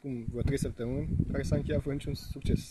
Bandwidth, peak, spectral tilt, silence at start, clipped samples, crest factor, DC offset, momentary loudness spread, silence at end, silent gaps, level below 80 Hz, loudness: 13 kHz; -14 dBFS; -7 dB/octave; 0.05 s; under 0.1%; 18 dB; under 0.1%; 6 LU; 0 s; none; -40 dBFS; -33 LUFS